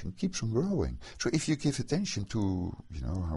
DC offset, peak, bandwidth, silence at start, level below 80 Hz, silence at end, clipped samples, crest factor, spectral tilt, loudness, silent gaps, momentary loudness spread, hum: under 0.1%; -14 dBFS; 11.5 kHz; 0 s; -44 dBFS; 0 s; under 0.1%; 18 dB; -5.5 dB/octave; -32 LUFS; none; 7 LU; none